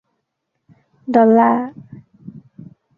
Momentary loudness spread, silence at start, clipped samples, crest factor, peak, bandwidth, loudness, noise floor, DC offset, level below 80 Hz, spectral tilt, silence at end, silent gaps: 19 LU; 1.1 s; under 0.1%; 18 dB; -2 dBFS; 5.2 kHz; -14 LUFS; -74 dBFS; under 0.1%; -64 dBFS; -9.5 dB/octave; 0.35 s; none